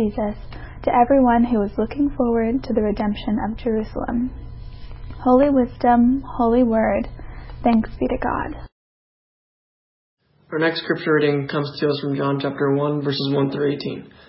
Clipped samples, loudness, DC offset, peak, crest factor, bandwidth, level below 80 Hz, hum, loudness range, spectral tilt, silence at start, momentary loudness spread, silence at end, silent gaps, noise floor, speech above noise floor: under 0.1%; -20 LUFS; under 0.1%; -4 dBFS; 18 dB; 5.8 kHz; -38 dBFS; none; 7 LU; -11.5 dB/octave; 0 s; 15 LU; 0.25 s; 8.72-10.17 s; under -90 dBFS; over 71 dB